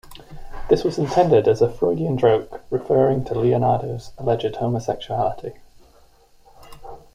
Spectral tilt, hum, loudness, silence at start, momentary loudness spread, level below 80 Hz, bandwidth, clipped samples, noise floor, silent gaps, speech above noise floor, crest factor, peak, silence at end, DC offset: -7.5 dB/octave; none; -20 LUFS; 0.05 s; 17 LU; -44 dBFS; 14.5 kHz; under 0.1%; -52 dBFS; none; 33 dB; 18 dB; -2 dBFS; 0.15 s; under 0.1%